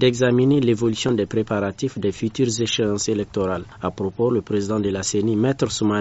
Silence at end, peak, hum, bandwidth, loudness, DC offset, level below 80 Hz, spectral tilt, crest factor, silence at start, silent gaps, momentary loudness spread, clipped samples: 0 s; -4 dBFS; none; 8 kHz; -21 LUFS; under 0.1%; -50 dBFS; -5.5 dB/octave; 16 dB; 0 s; none; 7 LU; under 0.1%